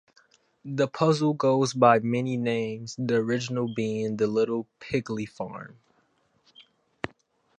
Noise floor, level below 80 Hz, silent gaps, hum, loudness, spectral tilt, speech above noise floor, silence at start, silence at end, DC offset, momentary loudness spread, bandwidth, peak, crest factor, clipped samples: -68 dBFS; -66 dBFS; none; none; -26 LUFS; -6 dB/octave; 42 dB; 0.65 s; 0.5 s; under 0.1%; 18 LU; 10 kHz; -4 dBFS; 22 dB; under 0.1%